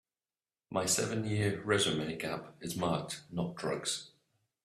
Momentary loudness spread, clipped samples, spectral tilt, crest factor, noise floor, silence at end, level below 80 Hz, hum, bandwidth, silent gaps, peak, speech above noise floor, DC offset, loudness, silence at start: 9 LU; under 0.1%; -3.5 dB/octave; 22 dB; under -90 dBFS; 0.55 s; -66 dBFS; none; 15 kHz; none; -14 dBFS; over 56 dB; under 0.1%; -34 LUFS; 0.7 s